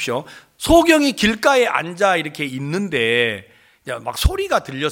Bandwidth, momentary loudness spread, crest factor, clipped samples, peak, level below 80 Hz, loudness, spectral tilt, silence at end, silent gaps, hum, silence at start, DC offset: 17 kHz; 13 LU; 18 dB; under 0.1%; 0 dBFS; -32 dBFS; -18 LUFS; -4.5 dB/octave; 0 s; none; none; 0 s; under 0.1%